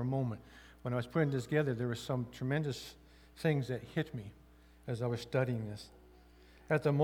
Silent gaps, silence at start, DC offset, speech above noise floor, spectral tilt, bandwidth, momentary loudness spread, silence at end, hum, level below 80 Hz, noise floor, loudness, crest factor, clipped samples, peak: none; 0 s; under 0.1%; 25 dB; -7 dB/octave; 15.5 kHz; 16 LU; 0 s; none; -62 dBFS; -60 dBFS; -36 LUFS; 20 dB; under 0.1%; -16 dBFS